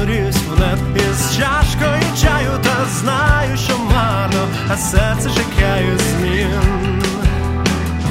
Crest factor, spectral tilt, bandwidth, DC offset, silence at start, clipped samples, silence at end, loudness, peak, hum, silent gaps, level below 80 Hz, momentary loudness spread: 14 dB; -5 dB/octave; 16.5 kHz; under 0.1%; 0 s; under 0.1%; 0 s; -16 LUFS; 0 dBFS; none; none; -22 dBFS; 3 LU